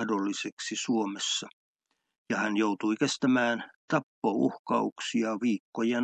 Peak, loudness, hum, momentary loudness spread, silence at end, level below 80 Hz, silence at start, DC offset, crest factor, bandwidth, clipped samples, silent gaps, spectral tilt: -12 dBFS; -29 LUFS; none; 7 LU; 0 s; -82 dBFS; 0 s; under 0.1%; 18 dB; 9.2 kHz; under 0.1%; 0.52-0.57 s, 1.53-1.75 s, 2.18-2.26 s, 3.76-3.88 s, 4.03-4.22 s, 4.59-4.64 s, 4.92-4.96 s, 5.60-5.72 s; -4 dB/octave